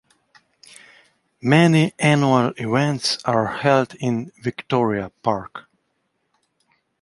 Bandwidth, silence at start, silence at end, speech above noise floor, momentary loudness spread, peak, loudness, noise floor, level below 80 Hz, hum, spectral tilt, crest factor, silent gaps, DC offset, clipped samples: 11.5 kHz; 1.45 s; 1.4 s; 52 dB; 12 LU; -2 dBFS; -20 LUFS; -71 dBFS; -58 dBFS; none; -6 dB/octave; 20 dB; none; under 0.1%; under 0.1%